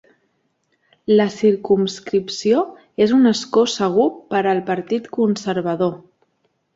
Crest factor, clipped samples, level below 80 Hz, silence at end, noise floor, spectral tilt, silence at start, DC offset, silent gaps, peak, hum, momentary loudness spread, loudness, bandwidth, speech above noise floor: 16 dB; under 0.1%; -62 dBFS; 0.8 s; -67 dBFS; -5.5 dB/octave; 1.1 s; under 0.1%; none; -4 dBFS; none; 7 LU; -18 LUFS; 7.8 kHz; 50 dB